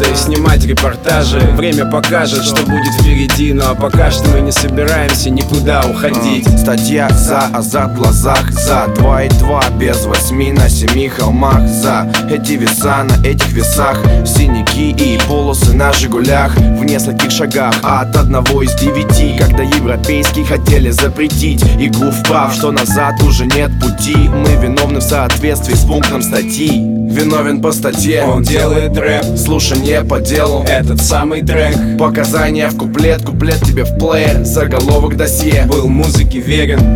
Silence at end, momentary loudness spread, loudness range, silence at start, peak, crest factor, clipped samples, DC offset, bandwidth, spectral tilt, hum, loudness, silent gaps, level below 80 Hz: 0 s; 3 LU; 1 LU; 0 s; 0 dBFS; 10 dB; under 0.1%; under 0.1%; 19.5 kHz; -5 dB/octave; none; -11 LUFS; none; -16 dBFS